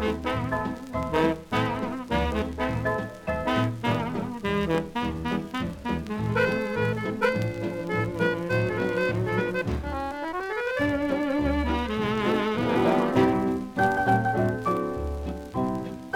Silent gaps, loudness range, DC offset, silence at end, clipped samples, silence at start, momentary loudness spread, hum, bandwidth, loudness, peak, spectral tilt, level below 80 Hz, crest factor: none; 4 LU; under 0.1%; 0 s; under 0.1%; 0 s; 8 LU; none; 17 kHz; -27 LUFS; -10 dBFS; -7 dB/octave; -42 dBFS; 18 dB